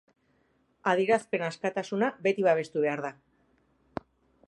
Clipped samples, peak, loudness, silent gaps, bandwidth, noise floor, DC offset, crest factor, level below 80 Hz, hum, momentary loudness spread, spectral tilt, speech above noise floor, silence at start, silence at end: under 0.1%; -10 dBFS; -28 LUFS; none; 11.5 kHz; -70 dBFS; under 0.1%; 20 dB; -72 dBFS; none; 17 LU; -5.5 dB/octave; 42 dB; 0.85 s; 1.35 s